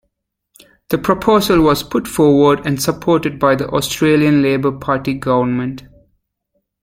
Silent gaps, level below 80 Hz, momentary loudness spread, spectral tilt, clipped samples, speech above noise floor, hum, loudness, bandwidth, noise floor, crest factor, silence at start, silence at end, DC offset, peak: none; -42 dBFS; 8 LU; -5.5 dB/octave; under 0.1%; 57 dB; none; -15 LUFS; 16.5 kHz; -71 dBFS; 14 dB; 0.9 s; 1 s; under 0.1%; 0 dBFS